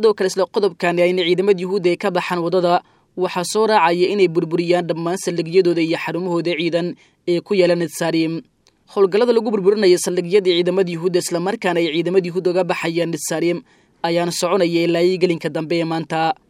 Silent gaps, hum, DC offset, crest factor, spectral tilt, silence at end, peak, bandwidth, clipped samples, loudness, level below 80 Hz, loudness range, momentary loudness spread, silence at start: none; none; under 0.1%; 18 dB; -5 dB/octave; 0.15 s; 0 dBFS; 15.5 kHz; under 0.1%; -18 LUFS; -68 dBFS; 2 LU; 7 LU; 0 s